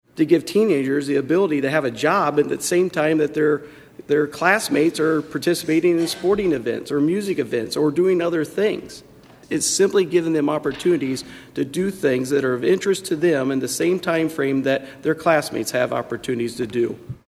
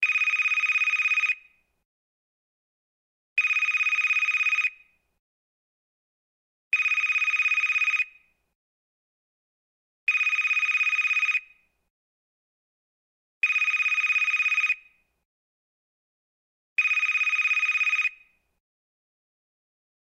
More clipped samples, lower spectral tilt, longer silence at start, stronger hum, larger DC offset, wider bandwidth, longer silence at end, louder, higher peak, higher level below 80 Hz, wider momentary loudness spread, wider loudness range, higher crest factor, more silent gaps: neither; first, -4.5 dB/octave vs 5 dB/octave; first, 0.15 s vs 0 s; neither; neither; about the same, 14.5 kHz vs 13.5 kHz; second, 0.15 s vs 1.95 s; about the same, -20 LUFS vs -22 LUFS; first, -2 dBFS vs -12 dBFS; first, -58 dBFS vs -78 dBFS; about the same, 7 LU vs 5 LU; about the same, 2 LU vs 1 LU; about the same, 18 dB vs 16 dB; second, none vs 1.85-3.36 s, 5.19-6.71 s, 8.55-10.07 s, 11.90-13.41 s, 15.25-16.76 s